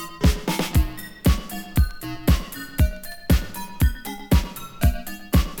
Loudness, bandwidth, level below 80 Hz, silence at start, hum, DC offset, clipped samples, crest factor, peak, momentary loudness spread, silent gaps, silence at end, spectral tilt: -24 LUFS; 19 kHz; -24 dBFS; 0 s; none; under 0.1%; under 0.1%; 18 dB; -4 dBFS; 8 LU; none; 0 s; -5.5 dB/octave